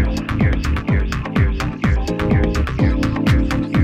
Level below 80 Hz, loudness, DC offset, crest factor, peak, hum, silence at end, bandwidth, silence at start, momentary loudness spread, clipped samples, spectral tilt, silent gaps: -22 dBFS; -19 LUFS; under 0.1%; 14 dB; -2 dBFS; none; 0 s; 13.5 kHz; 0 s; 3 LU; under 0.1%; -7 dB/octave; none